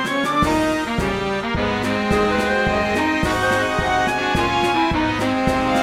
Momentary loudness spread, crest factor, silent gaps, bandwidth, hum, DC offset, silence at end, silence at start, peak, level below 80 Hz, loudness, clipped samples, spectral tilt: 3 LU; 14 dB; none; 16 kHz; none; 0.2%; 0 s; 0 s; -6 dBFS; -36 dBFS; -19 LUFS; under 0.1%; -5 dB/octave